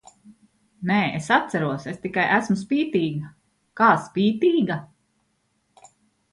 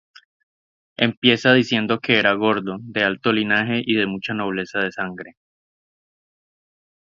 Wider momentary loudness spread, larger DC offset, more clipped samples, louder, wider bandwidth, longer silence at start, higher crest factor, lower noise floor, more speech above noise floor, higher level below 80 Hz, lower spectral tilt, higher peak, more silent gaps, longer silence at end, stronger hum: about the same, 12 LU vs 10 LU; neither; neither; second, -22 LUFS vs -19 LUFS; first, 11.5 kHz vs 7.4 kHz; second, 0.25 s vs 1 s; about the same, 20 dB vs 22 dB; second, -70 dBFS vs under -90 dBFS; second, 48 dB vs over 70 dB; about the same, -64 dBFS vs -60 dBFS; about the same, -6 dB/octave vs -5.5 dB/octave; second, -4 dBFS vs 0 dBFS; second, none vs 1.17-1.22 s; second, 1.45 s vs 1.8 s; neither